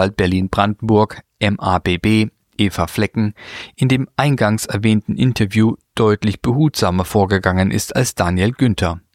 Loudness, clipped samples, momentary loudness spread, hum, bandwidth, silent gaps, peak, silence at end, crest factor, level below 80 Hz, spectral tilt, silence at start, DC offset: -17 LUFS; under 0.1%; 5 LU; none; 16 kHz; none; -2 dBFS; 0.15 s; 16 dB; -40 dBFS; -6 dB/octave; 0 s; under 0.1%